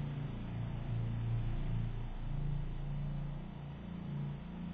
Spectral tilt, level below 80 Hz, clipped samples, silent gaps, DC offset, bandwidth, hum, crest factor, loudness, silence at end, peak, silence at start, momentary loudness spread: -8 dB/octave; -42 dBFS; under 0.1%; none; under 0.1%; 4.8 kHz; none; 12 dB; -41 LUFS; 0 s; -26 dBFS; 0 s; 7 LU